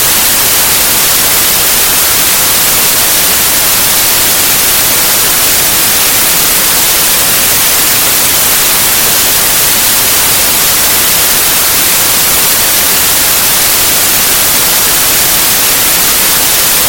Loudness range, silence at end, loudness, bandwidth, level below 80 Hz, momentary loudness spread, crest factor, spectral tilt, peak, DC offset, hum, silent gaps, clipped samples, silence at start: 0 LU; 0 s; -5 LUFS; over 20 kHz; -32 dBFS; 0 LU; 8 dB; 0 dB/octave; 0 dBFS; under 0.1%; none; none; 0.7%; 0 s